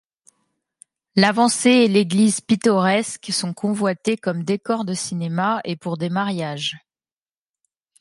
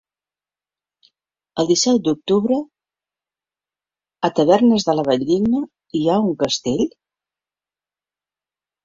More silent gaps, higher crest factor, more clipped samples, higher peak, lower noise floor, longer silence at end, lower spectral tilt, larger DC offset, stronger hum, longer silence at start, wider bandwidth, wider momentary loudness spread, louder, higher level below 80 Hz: neither; about the same, 20 dB vs 18 dB; neither; about the same, 0 dBFS vs -2 dBFS; about the same, under -90 dBFS vs under -90 dBFS; second, 1.25 s vs 1.95 s; about the same, -4.5 dB/octave vs -5 dB/octave; neither; second, none vs 50 Hz at -45 dBFS; second, 1.15 s vs 1.55 s; first, 11.5 kHz vs 7.8 kHz; about the same, 10 LU vs 9 LU; about the same, -20 LUFS vs -18 LUFS; second, -66 dBFS vs -58 dBFS